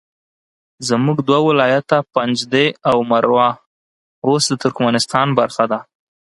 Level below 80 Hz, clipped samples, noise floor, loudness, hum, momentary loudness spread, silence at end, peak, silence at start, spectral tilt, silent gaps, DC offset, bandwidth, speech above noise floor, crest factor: -60 dBFS; under 0.1%; under -90 dBFS; -16 LUFS; none; 6 LU; 0.55 s; 0 dBFS; 0.8 s; -5 dB/octave; 3.66-4.22 s; under 0.1%; 11.5 kHz; over 75 dB; 16 dB